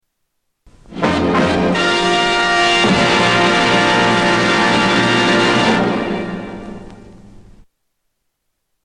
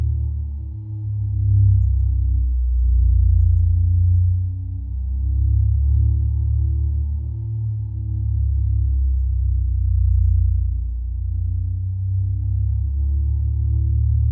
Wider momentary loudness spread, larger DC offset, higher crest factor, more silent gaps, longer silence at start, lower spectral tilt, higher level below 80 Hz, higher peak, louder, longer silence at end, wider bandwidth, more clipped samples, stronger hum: about the same, 11 LU vs 9 LU; neither; about the same, 14 dB vs 12 dB; neither; first, 0.9 s vs 0 s; second, -4 dB/octave vs -14 dB/octave; second, -42 dBFS vs -20 dBFS; first, -2 dBFS vs -6 dBFS; first, -13 LUFS vs -21 LUFS; first, 1.75 s vs 0 s; first, 11 kHz vs 0.9 kHz; neither; neither